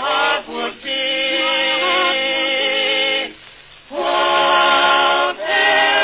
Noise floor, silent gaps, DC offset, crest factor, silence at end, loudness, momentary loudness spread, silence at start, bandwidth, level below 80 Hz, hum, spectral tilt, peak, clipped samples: -42 dBFS; none; under 0.1%; 14 dB; 0 s; -15 LUFS; 9 LU; 0 s; 4 kHz; -58 dBFS; none; -5 dB/octave; -2 dBFS; under 0.1%